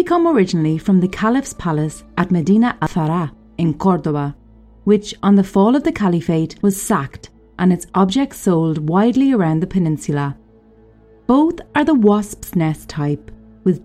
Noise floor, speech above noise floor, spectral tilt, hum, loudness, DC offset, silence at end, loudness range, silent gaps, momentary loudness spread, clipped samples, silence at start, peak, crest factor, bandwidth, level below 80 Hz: -47 dBFS; 32 dB; -7 dB/octave; none; -17 LUFS; under 0.1%; 0.05 s; 2 LU; none; 9 LU; under 0.1%; 0 s; -2 dBFS; 16 dB; 15 kHz; -44 dBFS